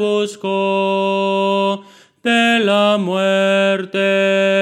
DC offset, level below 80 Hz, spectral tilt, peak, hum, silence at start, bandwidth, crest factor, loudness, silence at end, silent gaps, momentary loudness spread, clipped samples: under 0.1%; -72 dBFS; -5 dB/octave; -2 dBFS; none; 0 s; 13.5 kHz; 12 dB; -16 LUFS; 0 s; none; 6 LU; under 0.1%